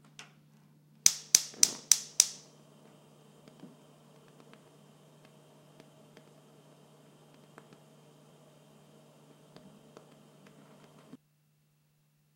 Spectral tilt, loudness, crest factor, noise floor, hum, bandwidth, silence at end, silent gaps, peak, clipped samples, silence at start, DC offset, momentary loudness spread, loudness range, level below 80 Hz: 1 dB/octave; -26 LUFS; 36 dB; -71 dBFS; none; 16 kHz; 10 s; none; -2 dBFS; under 0.1%; 1.05 s; under 0.1%; 27 LU; 7 LU; -76 dBFS